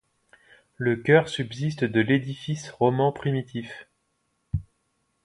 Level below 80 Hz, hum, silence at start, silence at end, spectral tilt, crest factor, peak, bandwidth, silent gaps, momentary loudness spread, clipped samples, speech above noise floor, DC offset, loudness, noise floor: -50 dBFS; none; 0.8 s; 0.65 s; -6.5 dB/octave; 22 dB; -4 dBFS; 11 kHz; none; 14 LU; under 0.1%; 49 dB; under 0.1%; -25 LUFS; -73 dBFS